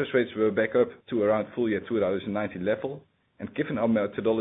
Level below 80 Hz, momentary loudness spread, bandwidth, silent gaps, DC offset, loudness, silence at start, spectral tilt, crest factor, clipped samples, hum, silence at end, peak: -64 dBFS; 8 LU; 4 kHz; none; under 0.1%; -27 LUFS; 0 s; -11 dB/octave; 16 dB; under 0.1%; none; 0 s; -10 dBFS